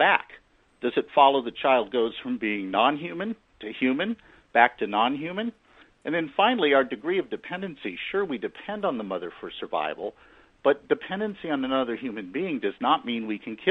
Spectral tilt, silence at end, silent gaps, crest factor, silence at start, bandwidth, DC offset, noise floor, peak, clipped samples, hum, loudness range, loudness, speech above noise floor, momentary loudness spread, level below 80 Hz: -7 dB/octave; 0 s; none; 22 dB; 0 s; 5.6 kHz; under 0.1%; -54 dBFS; -4 dBFS; under 0.1%; none; 5 LU; -26 LUFS; 28 dB; 13 LU; -66 dBFS